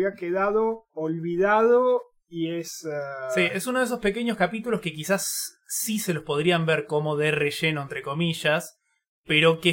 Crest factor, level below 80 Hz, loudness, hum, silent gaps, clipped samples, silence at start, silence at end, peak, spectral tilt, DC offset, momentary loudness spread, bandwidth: 18 dB; -60 dBFS; -25 LUFS; none; 9.08-9.24 s; under 0.1%; 0 s; 0 s; -6 dBFS; -4 dB/octave; under 0.1%; 11 LU; 17 kHz